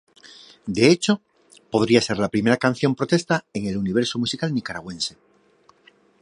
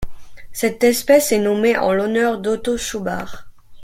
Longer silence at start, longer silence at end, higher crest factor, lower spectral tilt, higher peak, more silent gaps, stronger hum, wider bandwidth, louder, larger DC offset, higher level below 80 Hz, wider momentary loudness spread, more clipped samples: first, 0.65 s vs 0 s; first, 1.1 s vs 0 s; about the same, 20 dB vs 16 dB; about the same, -5 dB/octave vs -4 dB/octave; about the same, -2 dBFS vs -2 dBFS; neither; neither; second, 11.5 kHz vs 16.5 kHz; second, -22 LUFS vs -18 LUFS; neither; second, -56 dBFS vs -42 dBFS; second, 11 LU vs 14 LU; neither